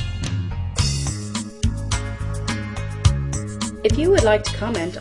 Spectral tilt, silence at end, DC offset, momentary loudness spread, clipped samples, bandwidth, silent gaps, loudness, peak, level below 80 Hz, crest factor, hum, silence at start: -5 dB/octave; 0 s; under 0.1%; 11 LU; under 0.1%; 11.5 kHz; none; -22 LUFS; -2 dBFS; -30 dBFS; 20 dB; none; 0 s